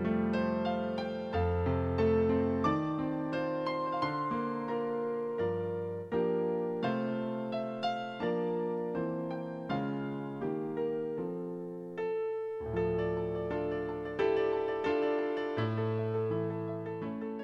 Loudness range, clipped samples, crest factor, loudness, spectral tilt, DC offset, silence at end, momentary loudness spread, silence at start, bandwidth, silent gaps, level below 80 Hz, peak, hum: 4 LU; under 0.1%; 16 dB; -34 LUFS; -8.5 dB/octave; under 0.1%; 0 s; 7 LU; 0 s; 7 kHz; none; -60 dBFS; -16 dBFS; none